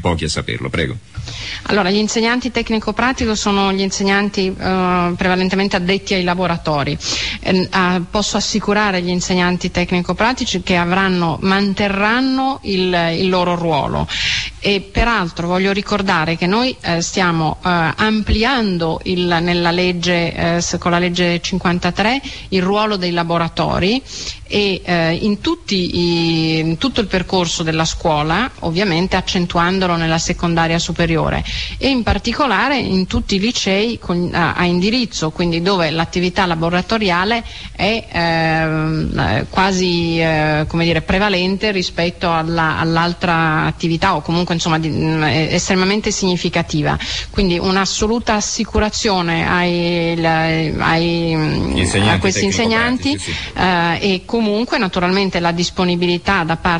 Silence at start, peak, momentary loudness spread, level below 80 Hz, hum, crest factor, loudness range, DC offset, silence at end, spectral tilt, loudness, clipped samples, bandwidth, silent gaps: 0 s; -2 dBFS; 4 LU; -34 dBFS; none; 14 dB; 1 LU; 0.5%; 0 s; -4.5 dB/octave; -16 LUFS; under 0.1%; 10.5 kHz; none